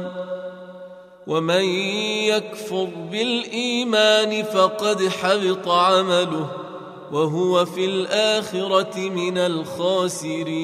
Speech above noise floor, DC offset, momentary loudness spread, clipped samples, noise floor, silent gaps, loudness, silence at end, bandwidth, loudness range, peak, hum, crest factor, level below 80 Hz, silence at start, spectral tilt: 20 dB; under 0.1%; 14 LU; under 0.1%; -41 dBFS; none; -21 LUFS; 0 s; 15 kHz; 4 LU; -4 dBFS; none; 18 dB; -70 dBFS; 0 s; -4 dB/octave